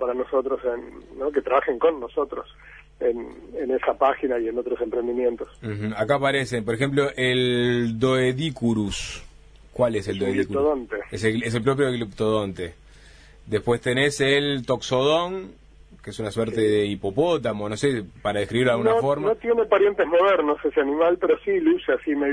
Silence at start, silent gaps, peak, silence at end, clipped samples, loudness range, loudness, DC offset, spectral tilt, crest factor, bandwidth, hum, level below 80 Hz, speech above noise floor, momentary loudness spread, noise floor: 0 s; none; -6 dBFS; 0 s; under 0.1%; 5 LU; -23 LUFS; under 0.1%; -5.5 dB/octave; 16 dB; 10.5 kHz; none; -50 dBFS; 25 dB; 11 LU; -48 dBFS